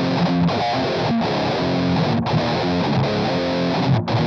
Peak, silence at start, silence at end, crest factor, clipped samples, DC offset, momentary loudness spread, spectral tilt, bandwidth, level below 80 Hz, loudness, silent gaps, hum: -8 dBFS; 0 s; 0 s; 10 dB; under 0.1%; under 0.1%; 2 LU; -7 dB/octave; 7 kHz; -46 dBFS; -20 LUFS; none; none